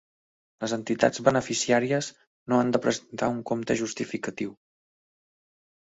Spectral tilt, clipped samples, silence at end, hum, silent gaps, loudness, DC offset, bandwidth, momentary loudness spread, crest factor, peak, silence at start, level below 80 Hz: -4.5 dB/octave; under 0.1%; 1.3 s; none; 2.27-2.46 s; -27 LUFS; under 0.1%; 8 kHz; 12 LU; 24 dB; -4 dBFS; 0.6 s; -64 dBFS